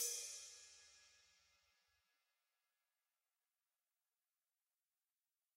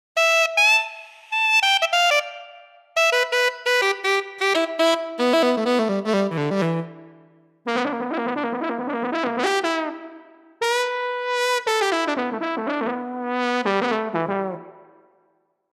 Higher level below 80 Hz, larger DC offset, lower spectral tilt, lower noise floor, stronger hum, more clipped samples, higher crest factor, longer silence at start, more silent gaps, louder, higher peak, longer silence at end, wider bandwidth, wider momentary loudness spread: second, under -90 dBFS vs -78 dBFS; neither; second, 3.5 dB/octave vs -3.5 dB/octave; first, under -90 dBFS vs -67 dBFS; neither; neither; first, 28 dB vs 16 dB; second, 0 s vs 0.15 s; neither; second, -49 LUFS vs -21 LUFS; second, -30 dBFS vs -6 dBFS; first, 4.35 s vs 0.95 s; about the same, 15.5 kHz vs 15.5 kHz; first, 22 LU vs 11 LU